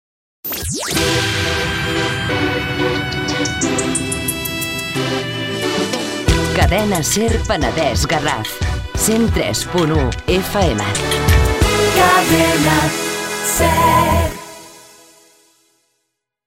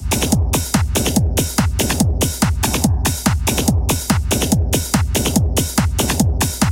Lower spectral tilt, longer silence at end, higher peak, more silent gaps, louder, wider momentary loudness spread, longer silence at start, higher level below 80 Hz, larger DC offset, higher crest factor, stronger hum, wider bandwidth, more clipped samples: about the same, -4 dB/octave vs -4.5 dB/octave; first, 1.65 s vs 0 s; about the same, 0 dBFS vs 0 dBFS; neither; about the same, -16 LUFS vs -17 LUFS; first, 8 LU vs 1 LU; first, 0.45 s vs 0 s; about the same, -28 dBFS vs -24 dBFS; neither; about the same, 16 dB vs 16 dB; neither; about the same, 16.5 kHz vs 17.5 kHz; neither